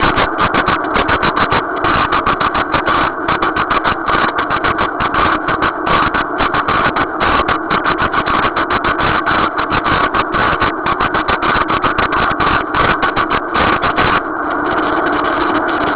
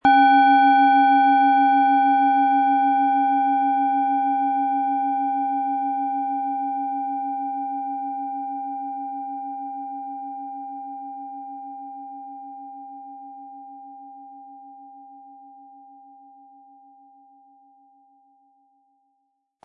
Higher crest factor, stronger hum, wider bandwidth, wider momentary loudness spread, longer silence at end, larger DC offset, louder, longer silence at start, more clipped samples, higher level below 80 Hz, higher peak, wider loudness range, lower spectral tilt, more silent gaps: about the same, 14 dB vs 18 dB; neither; second, 4 kHz vs 4.6 kHz; second, 2 LU vs 24 LU; second, 0 s vs 4.3 s; neither; first, -14 LUFS vs -20 LUFS; about the same, 0 s vs 0.05 s; neither; first, -32 dBFS vs -70 dBFS; first, 0 dBFS vs -6 dBFS; second, 1 LU vs 23 LU; first, -8.5 dB/octave vs -6 dB/octave; neither